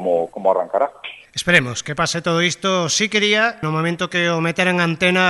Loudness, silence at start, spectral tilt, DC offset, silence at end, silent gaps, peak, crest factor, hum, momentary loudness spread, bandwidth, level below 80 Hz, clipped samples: -18 LUFS; 0 s; -3.5 dB/octave; under 0.1%; 0 s; none; -2 dBFS; 18 dB; none; 7 LU; 11.5 kHz; -54 dBFS; under 0.1%